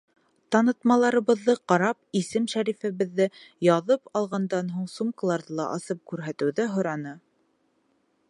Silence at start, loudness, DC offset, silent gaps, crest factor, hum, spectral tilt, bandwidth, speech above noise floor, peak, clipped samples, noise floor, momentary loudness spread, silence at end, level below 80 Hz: 0.5 s; -26 LUFS; under 0.1%; none; 20 dB; none; -6 dB/octave; 11.5 kHz; 44 dB; -6 dBFS; under 0.1%; -69 dBFS; 10 LU; 1.1 s; -76 dBFS